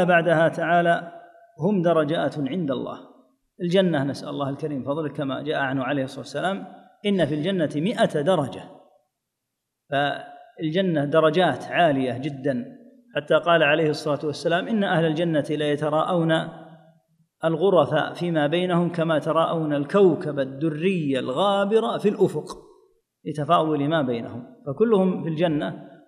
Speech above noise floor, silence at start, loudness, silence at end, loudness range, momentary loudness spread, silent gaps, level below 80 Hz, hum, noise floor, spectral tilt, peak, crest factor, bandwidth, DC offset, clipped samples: 59 dB; 0 s; -23 LUFS; 0.2 s; 4 LU; 12 LU; none; -68 dBFS; none; -81 dBFS; -7 dB/octave; -4 dBFS; 18 dB; 11.5 kHz; under 0.1%; under 0.1%